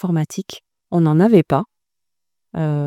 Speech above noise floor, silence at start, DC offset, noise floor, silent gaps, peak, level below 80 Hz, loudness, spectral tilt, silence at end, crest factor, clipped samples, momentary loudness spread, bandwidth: 68 dB; 0.05 s; under 0.1%; -85 dBFS; none; 0 dBFS; -56 dBFS; -17 LUFS; -8 dB/octave; 0 s; 18 dB; under 0.1%; 20 LU; 14 kHz